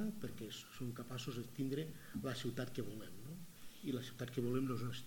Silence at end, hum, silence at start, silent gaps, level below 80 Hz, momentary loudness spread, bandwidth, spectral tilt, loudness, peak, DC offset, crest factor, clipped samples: 0 s; none; 0 s; none; -70 dBFS; 12 LU; 17.5 kHz; -6 dB/octave; -45 LUFS; -26 dBFS; under 0.1%; 18 dB; under 0.1%